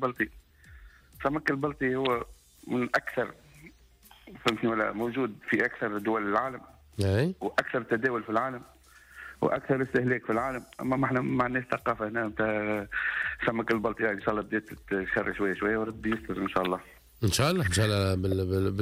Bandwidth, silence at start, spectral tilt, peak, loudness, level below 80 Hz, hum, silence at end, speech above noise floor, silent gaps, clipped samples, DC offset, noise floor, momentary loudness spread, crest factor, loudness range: 16 kHz; 0 s; -5.5 dB/octave; -14 dBFS; -29 LUFS; -54 dBFS; none; 0 s; 28 dB; none; under 0.1%; under 0.1%; -57 dBFS; 7 LU; 16 dB; 3 LU